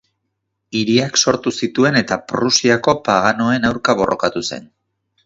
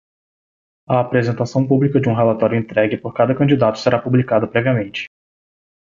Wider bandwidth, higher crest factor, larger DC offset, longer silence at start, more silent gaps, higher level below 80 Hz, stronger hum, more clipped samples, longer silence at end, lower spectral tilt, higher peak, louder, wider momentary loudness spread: about the same, 7.8 kHz vs 7.4 kHz; about the same, 18 dB vs 16 dB; neither; second, 0.7 s vs 0.9 s; neither; about the same, -50 dBFS vs -52 dBFS; neither; neither; second, 0.6 s vs 0.85 s; second, -3.5 dB/octave vs -8 dB/octave; about the same, 0 dBFS vs -2 dBFS; about the same, -16 LUFS vs -17 LUFS; first, 8 LU vs 5 LU